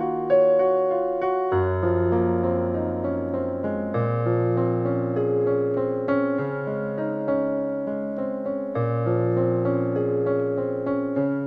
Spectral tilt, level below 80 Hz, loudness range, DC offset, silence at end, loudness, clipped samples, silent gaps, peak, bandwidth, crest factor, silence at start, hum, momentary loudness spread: -11.5 dB/octave; -56 dBFS; 3 LU; under 0.1%; 0 s; -24 LUFS; under 0.1%; none; -10 dBFS; 4.9 kHz; 14 dB; 0 s; none; 6 LU